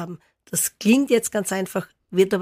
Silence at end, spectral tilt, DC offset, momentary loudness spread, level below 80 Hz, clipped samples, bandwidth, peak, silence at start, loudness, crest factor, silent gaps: 0 s; -4 dB/octave; under 0.1%; 12 LU; -64 dBFS; under 0.1%; 15.5 kHz; -6 dBFS; 0 s; -22 LUFS; 16 dB; none